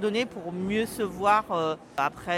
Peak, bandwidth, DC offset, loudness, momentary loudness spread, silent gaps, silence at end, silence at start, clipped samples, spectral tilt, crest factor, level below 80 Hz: -10 dBFS; 16 kHz; under 0.1%; -27 LUFS; 7 LU; none; 0 s; 0 s; under 0.1%; -5 dB/octave; 18 dB; -58 dBFS